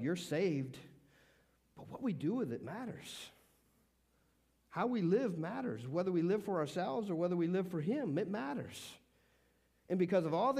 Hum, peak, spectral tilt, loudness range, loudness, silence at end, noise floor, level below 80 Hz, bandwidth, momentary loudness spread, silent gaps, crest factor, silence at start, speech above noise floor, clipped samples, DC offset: none; -22 dBFS; -7 dB/octave; 8 LU; -37 LUFS; 0 s; -75 dBFS; -78 dBFS; 15.5 kHz; 15 LU; none; 16 dB; 0 s; 38 dB; under 0.1%; under 0.1%